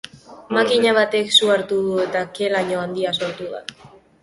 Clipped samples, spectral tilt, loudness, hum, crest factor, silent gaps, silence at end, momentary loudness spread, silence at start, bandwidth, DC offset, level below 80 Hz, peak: under 0.1%; -3.5 dB/octave; -19 LUFS; none; 20 dB; none; 0.35 s; 16 LU; 0.15 s; 11.5 kHz; under 0.1%; -62 dBFS; -2 dBFS